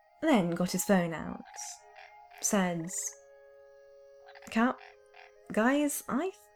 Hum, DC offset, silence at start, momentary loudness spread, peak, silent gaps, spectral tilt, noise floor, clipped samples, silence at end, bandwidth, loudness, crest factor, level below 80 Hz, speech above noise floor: none; under 0.1%; 0.2 s; 16 LU; -12 dBFS; none; -4.5 dB/octave; -56 dBFS; under 0.1%; 0.25 s; 19 kHz; -31 LUFS; 20 dB; -66 dBFS; 26 dB